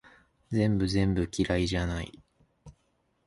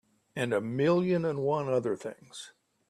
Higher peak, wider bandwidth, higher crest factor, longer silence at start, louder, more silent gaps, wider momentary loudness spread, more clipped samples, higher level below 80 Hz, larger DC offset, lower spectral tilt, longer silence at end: about the same, -12 dBFS vs -14 dBFS; second, 11.5 kHz vs 13.5 kHz; about the same, 18 dB vs 16 dB; first, 0.5 s vs 0.35 s; about the same, -29 LUFS vs -29 LUFS; neither; second, 8 LU vs 18 LU; neither; first, -42 dBFS vs -72 dBFS; neither; about the same, -6.5 dB/octave vs -7 dB/octave; first, 0.55 s vs 0.4 s